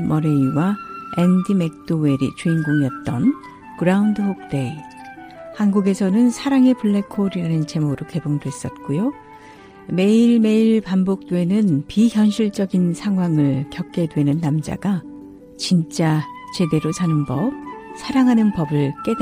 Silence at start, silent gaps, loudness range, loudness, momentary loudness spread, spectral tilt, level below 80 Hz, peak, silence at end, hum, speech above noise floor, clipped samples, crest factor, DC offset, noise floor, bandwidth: 0 s; none; 4 LU; -19 LUFS; 13 LU; -7 dB/octave; -52 dBFS; -4 dBFS; 0 s; none; 24 dB; under 0.1%; 16 dB; under 0.1%; -42 dBFS; 15 kHz